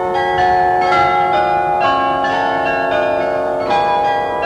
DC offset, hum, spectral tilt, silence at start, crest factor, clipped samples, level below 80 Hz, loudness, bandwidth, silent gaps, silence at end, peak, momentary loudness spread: under 0.1%; none; -5 dB/octave; 0 s; 12 dB; under 0.1%; -44 dBFS; -15 LUFS; 10.5 kHz; none; 0 s; -2 dBFS; 4 LU